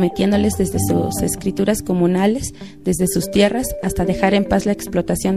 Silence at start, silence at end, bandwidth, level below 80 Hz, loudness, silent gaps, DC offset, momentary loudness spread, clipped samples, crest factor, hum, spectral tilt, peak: 0 s; 0 s; 15.5 kHz; -36 dBFS; -18 LUFS; none; 0.6%; 6 LU; under 0.1%; 18 dB; none; -5.5 dB/octave; 0 dBFS